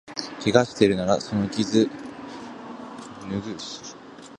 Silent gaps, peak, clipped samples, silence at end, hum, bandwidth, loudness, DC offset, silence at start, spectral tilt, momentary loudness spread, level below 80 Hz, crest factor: none; -2 dBFS; under 0.1%; 0 s; none; 11 kHz; -24 LUFS; under 0.1%; 0.05 s; -5.5 dB/octave; 18 LU; -56 dBFS; 24 dB